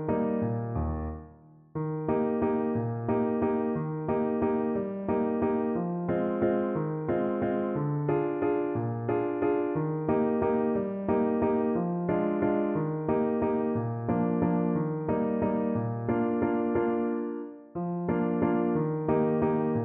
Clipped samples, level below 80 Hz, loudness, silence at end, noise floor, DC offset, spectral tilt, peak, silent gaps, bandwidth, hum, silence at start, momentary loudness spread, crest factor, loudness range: under 0.1%; -52 dBFS; -29 LUFS; 0 s; -53 dBFS; under 0.1%; -9.5 dB/octave; -14 dBFS; none; 3.5 kHz; none; 0 s; 5 LU; 14 dB; 2 LU